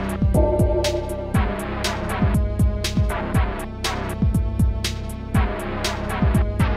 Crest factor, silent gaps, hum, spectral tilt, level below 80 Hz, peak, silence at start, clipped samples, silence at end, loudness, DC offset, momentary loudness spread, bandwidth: 14 dB; none; none; -6 dB/octave; -26 dBFS; -6 dBFS; 0 s; under 0.1%; 0 s; -22 LUFS; 0.1%; 6 LU; 15 kHz